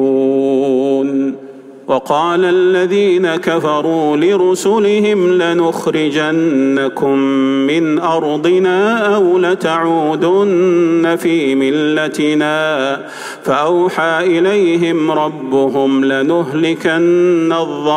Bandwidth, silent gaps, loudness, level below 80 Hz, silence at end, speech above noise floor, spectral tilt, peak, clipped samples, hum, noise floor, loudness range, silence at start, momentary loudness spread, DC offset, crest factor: 14 kHz; none; -13 LUFS; -64 dBFS; 0 s; 21 dB; -5.5 dB/octave; -2 dBFS; under 0.1%; none; -33 dBFS; 2 LU; 0 s; 4 LU; under 0.1%; 12 dB